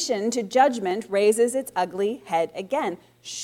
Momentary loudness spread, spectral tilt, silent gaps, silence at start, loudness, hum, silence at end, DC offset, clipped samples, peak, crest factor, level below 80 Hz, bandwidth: 8 LU; -3.5 dB/octave; none; 0 s; -24 LUFS; none; 0 s; under 0.1%; under 0.1%; -6 dBFS; 18 dB; -70 dBFS; 16 kHz